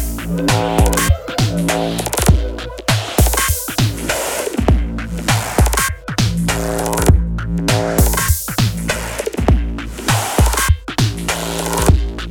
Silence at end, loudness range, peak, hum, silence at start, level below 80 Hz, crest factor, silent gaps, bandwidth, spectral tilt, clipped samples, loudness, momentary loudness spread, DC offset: 0 s; 1 LU; 0 dBFS; none; 0 s; -20 dBFS; 16 dB; none; 18 kHz; -4.5 dB/octave; under 0.1%; -17 LUFS; 6 LU; under 0.1%